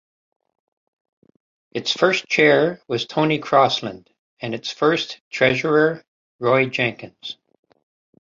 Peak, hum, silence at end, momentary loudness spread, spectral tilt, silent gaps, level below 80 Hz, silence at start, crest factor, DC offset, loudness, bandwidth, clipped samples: -2 dBFS; none; 0.95 s; 17 LU; -5 dB/octave; 4.19-4.37 s, 5.21-5.31 s, 6.08-6.39 s; -62 dBFS; 1.75 s; 20 dB; under 0.1%; -19 LUFS; 7.6 kHz; under 0.1%